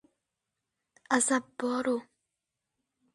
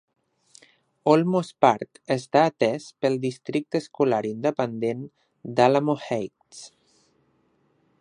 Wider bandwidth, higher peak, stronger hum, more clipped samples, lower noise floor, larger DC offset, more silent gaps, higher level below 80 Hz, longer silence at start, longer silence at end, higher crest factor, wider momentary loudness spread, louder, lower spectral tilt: about the same, 11.5 kHz vs 11 kHz; second, -12 dBFS vs -2 dBFS; neither; neither; first, -86 dBFS vs -66 dBFS; neither; neither; second, -78 dBFS vs -72 dBFS; about the same, 1.1 s vs 1.05 s; second, 1.1 s vs 1.35 s; about the same, 22 dB vs 24 dB; second, 7 LU vs 16 LU; second, -30 LUFS vs -24 LUFS; second, -2 dB/octave vs -6.5 dB/octave